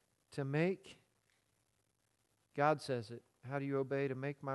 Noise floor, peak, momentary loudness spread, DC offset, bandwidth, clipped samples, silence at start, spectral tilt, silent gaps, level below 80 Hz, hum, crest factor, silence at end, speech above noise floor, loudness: -80 dBFS; -18 dBFS; 15 LU; under 0.1%; 12 kHz; under 0.1%; 0.3 s; -7 dB/octave; none; -82 dBFS; none; 22 dB; 0 s; 43 dB; -38 LUFS